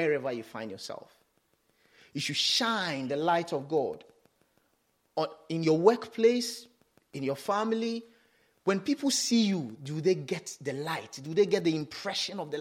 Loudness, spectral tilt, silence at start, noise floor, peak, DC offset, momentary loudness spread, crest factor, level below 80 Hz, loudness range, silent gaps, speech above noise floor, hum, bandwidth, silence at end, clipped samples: -30 LUFS; -4 dB/octave; 0 s; -73 dBFS; -8 dBFS; under 0.1%; 14 LU; 24 dB; -78 dBFS; 2 LU; none; 44 dB; none; 16.5 kHz; 0 s; under 0.1%